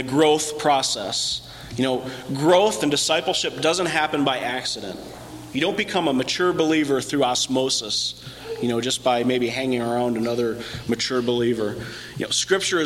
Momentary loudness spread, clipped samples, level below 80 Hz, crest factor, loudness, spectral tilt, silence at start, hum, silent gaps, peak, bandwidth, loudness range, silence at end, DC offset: 11 LU; under 0.1%; -54 dBFS; 16 dB; -22 LUFS; -3.5 dB/octave; 0 s; 60 Hz at -50 dBFS; none; -6 dBFS; 16.5 kHz; 2 LU; 0 s; under 0.1%